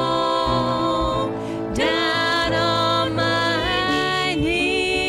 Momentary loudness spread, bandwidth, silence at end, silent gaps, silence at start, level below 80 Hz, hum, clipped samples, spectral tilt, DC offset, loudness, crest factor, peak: 3 LU; 15.5 kHz; 0 s; none; 0 s; -38 dBFS; none; under 0.1%; -4.5 dB/octave; under 0.1%; -20 LUFS; 12 dB; -8 dBFS